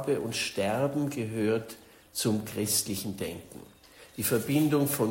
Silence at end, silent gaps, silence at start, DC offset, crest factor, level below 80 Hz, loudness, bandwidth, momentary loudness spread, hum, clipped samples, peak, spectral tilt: 0 s; none; 0 s; under 0.1%; 16 dB; -62 dBFS; -29 LUFS; 16.5 kHz; 19 LU; none; under 0.1%; -14 dBFS; -4.5 dB/octave